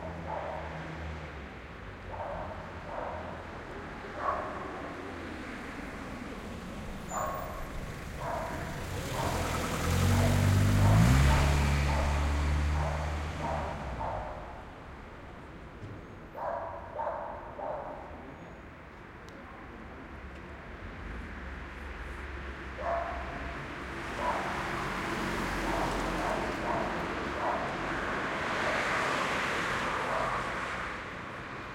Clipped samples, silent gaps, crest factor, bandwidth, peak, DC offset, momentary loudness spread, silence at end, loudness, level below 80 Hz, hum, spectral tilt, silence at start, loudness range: under 0.1%; none; 22 dB; 16.5 kHz; -12 dBFS; under 0.1%; 18 LU; 0 s; -33 LUFS; -40 dBFS; none; -5.5 dB/octave; 0 s; 15 LU